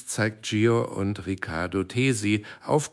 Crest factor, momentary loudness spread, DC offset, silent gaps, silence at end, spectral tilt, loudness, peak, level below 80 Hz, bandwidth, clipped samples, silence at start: 16 dB; 7 LU; under 0.1%; none; 0.05 s; -5.5 dB/octave; -26 LUFS; -10 dBFS; -58 dBFS; 12 kHz; under 0.1%; 0 s